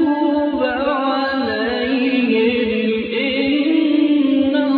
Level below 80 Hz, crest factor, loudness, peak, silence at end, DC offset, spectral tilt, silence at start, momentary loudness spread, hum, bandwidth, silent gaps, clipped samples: -50 dBFS; 12 dB; -17 LUFS; -4 dBFS; 0 s; under 0.1%; -8 dB/octave; 0 s; 4 LU; none; 4.9 kHz; none; under 0.1%